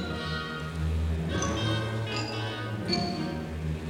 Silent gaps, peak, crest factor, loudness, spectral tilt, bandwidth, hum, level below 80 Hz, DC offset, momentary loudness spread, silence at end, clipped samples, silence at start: none; -14 dBFS; 16 dB; -31 LUFS; -5 dB/octave; 15 kHz; none; -40 dBFS; under 0.1%; 5 LU; 0 s; under 0.1%; 0 s